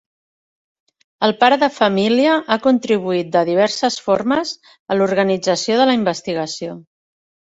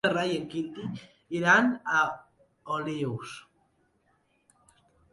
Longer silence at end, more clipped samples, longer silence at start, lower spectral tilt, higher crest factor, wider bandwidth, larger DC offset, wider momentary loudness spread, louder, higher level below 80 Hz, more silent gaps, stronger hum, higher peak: second, 0.75 s vs 1.7 s; neither; first, 1.2 s vs 0.05 s; about the same, -4.5 dB/octave vs -5 dB/octave; about the same, 18 dB vs 22 dB; second, 8 kHz vs 11.5 kHz; neither; second, 9 LU vs 21 LU; first, -17 LUFS vs -28 LUFS; first, -60 dBFS vs -70 dBFS; first, 4.79-4.86 s vs none; neither; first, 0 dBFS vs -10 dBFS